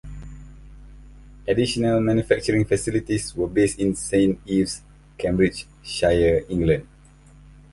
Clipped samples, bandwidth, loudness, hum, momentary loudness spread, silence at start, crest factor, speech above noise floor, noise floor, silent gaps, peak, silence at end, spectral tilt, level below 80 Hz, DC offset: under 0.1%; 11.5 kHz; -22 LUFS; none; 12 LU; 0.05 s; 20 dB; 28 dB; -49 dBFS; none; -4 dBFS; 0.85 s; -5.5 dB/octave; -40 dBFS; under 0.1%